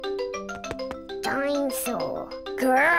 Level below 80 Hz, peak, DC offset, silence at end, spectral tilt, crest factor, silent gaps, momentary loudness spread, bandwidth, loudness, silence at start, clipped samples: -54 dBFS; -12 dBFS; 0.1%; 0 s; -3 dB/octave; 14 dB; none; 10 LU; 16 kHz; -28 LUFS; 0 s; under 0.1%